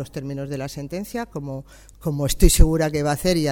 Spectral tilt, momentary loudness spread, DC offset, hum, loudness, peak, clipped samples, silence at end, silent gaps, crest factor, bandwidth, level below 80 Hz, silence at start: -5 dB/octave; 14 LU; under 0.1%; none; -23 LUFS; 0 dBFS; under 0.1%; 0 s; none; 20 dB; 18.5 kHz; -24 dBFS; 0 s